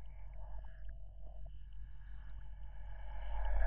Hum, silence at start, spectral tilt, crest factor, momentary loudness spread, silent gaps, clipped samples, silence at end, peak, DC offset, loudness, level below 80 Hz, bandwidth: none; 0 s; -5.5 dB/octave; 18 dB; 9 LU; none; under 0.1%; 0 s; -22 dBFS; under 0.1%; -52 LUFS; -46 dBFS; 3.4 kHz